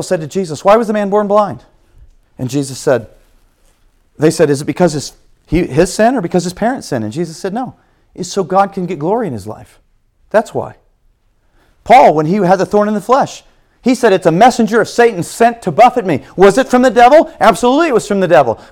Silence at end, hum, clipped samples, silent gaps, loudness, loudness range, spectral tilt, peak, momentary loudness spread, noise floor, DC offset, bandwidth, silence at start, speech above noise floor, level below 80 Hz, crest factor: 0.15 s; none; 0.6%; none; -12 LUFS; 8 LU; -5.5 dB/octave; 0 dBFS; 13 LU; -54 dBFS; under 0.1%; 17.5 kHz; 0 s; 43 dB; -40 dBFS; 12 dB